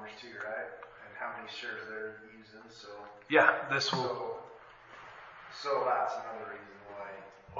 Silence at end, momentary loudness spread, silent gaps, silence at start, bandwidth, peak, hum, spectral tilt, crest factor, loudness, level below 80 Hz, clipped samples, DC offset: 0 s; 23 LU; none; 0 s; 7.4 kHz; -8 dBFS; none; -1.5 dB/octave; 28 dB; -33 LUFS; -74 dBFS; under 0.1%; under 0.1%